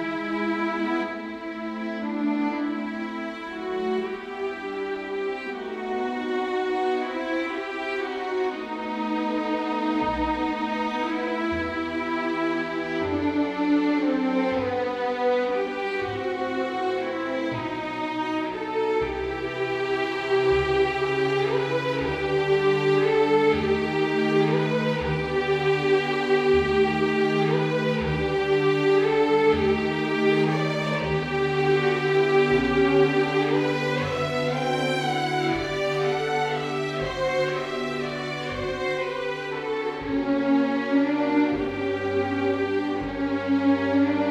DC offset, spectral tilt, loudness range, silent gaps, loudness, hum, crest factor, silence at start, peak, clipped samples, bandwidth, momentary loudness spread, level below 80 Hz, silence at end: under 0.1%; -6.5 dB/octave; 6 LU; none; -25 LUFS; none; 16 dB; 0 s; -8 dBFS; under 0.1%; 11 kHz; 8 LU; -48 dBFS; 0 s